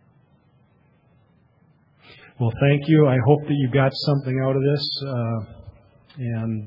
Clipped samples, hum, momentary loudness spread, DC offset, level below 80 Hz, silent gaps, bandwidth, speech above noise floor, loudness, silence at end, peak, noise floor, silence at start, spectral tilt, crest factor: under 0.1%; none; 11 LU; under 0.1%; -56 dBFS; none; 5.6 kHz; 39 dB; -21 LUFS; 0 s; -2 dBFS; -59 dBFS; 2.4 s; -9 dB/octave; 20 dB